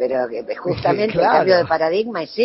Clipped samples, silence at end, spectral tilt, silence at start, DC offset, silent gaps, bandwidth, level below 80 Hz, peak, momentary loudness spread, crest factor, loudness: under 0.1%; 0 s; -9 dB/octave; 0 s; under 0.1%; none; 5.8 kHz; -52 dBFS; -2 dBFS; 10 LU; 16 dB; -18 LUFS